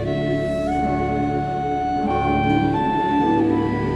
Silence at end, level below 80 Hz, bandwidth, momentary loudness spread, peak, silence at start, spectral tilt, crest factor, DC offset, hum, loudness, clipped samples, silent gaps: 0 s; -36 dBFS; 10.5 kHz; 4 LU; -6 dBFS; 0 s; -8 dB/octave; 14 dB; under 0.1%; none; -21 LUFS; under 0.1%; none